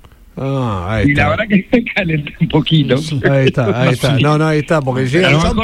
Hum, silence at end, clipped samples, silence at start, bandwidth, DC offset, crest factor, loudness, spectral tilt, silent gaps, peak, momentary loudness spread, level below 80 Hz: none; 0 s; under 0.1%; 0.35 s; 13 kHz; under 0.1%; 12 dB; -14 LUFS; -6.5 dB/octave; none; 0 dBFS; 6 LU; -32 dBFS